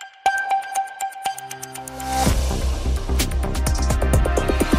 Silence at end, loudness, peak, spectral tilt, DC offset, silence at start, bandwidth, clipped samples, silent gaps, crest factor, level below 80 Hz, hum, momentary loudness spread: 0 s; -23 LUFS; -4 dBFS; -4.5 dB/octave; under 0.1%; 0 s; 16 kHz; under 0.1%; none; 18 dB; -24 dBFS; none; 10 LU